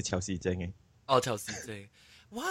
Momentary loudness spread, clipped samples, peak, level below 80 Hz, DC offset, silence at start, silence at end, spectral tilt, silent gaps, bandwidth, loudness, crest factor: 17 LU; under 0.1%; -12 dBFS; -58 dBFS; under 0.1%; 0 s; 0 s; -4 dB/octave; none; 16 kHz; -33 LUFS; 22 dB